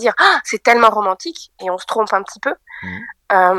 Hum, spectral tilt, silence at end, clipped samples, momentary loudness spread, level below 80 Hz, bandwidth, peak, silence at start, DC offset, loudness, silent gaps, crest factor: none; -2.5 dB/octave; 0 s; 0.1%; 17 LU; -60 dBFS; 14 kHz; 0 dBFS; 0 s; under 0.1%; -15 LUFS; none; 16 dB